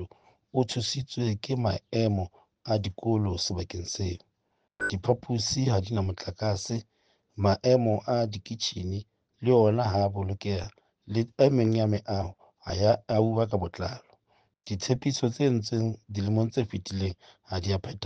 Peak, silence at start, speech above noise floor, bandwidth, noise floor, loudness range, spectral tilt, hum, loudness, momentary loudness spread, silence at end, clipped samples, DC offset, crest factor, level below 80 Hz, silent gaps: -8 dBFS; 0 s; 49 dB; 9 kHz; -76 dBFS; 4 LU; -6 dB/octave; none; -28 LUFS; 12 LU; 0 s; under 0.1%; under 0.1%; 20 dB; -54 dBFS; none